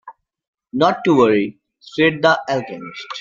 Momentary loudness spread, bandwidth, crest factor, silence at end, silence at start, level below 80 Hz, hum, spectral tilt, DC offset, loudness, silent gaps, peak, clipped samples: 16 LU; 7.6 kHz; 18 dB; 0 s; 0.05 s; -60 dBFS; none; -6 dB/octave; under 0.1%; -17 LUFS; 0.48-0.53 s; -2 dBFS; under 0.1%